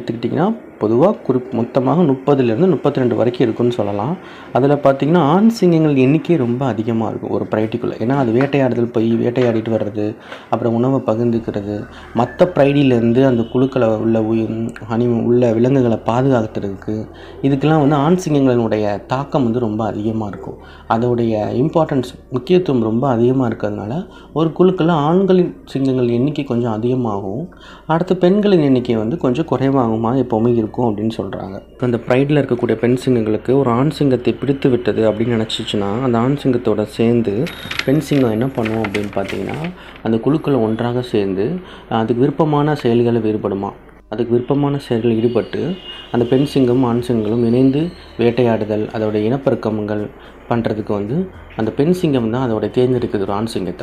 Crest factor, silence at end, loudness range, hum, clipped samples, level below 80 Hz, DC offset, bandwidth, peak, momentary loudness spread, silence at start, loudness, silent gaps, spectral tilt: 16 dB; 0 s; 3 LU; none; under 0.1%; -44 dBFS; under 0.1%; 12.5 kHz; 0 dBFS; 10 LU; 0 s; -17 LUFS; none; -8 dB/octave